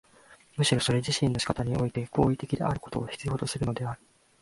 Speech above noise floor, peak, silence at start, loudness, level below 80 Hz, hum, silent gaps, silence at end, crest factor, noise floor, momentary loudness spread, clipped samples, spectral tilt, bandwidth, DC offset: 29 dB; -8 dBFS; 0.3 s; -29 LUFS; -50 dBFS; none; none; 0.45 s; 22 dB; -57 dBFS; 9 LU; under 0.1%; -5 dB/octave; 11.5 kHz; under 0.1%